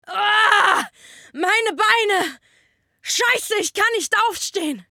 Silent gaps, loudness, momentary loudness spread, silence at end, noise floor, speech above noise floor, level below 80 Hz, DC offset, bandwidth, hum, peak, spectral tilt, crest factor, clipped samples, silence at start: none; -18 LUFS; 12 LU; 0.1 s; -62 dBFS; 42 dB; -68 dBFS; under 0.1%; 19.5 kHz; none; 0 dBFS; 0 dB/octave; 20 dB; under 0.1%; 0.1 s